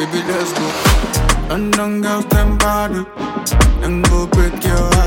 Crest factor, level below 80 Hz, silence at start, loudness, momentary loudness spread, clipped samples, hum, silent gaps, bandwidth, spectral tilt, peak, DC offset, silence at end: 14 dB; -18 dBFS; 0 s; -16 LUFS; 5 LU; under 0.1%; none; none; 17 kHz; -4.5 dB/octave; 0 dBFS; under 0.1%; 0 s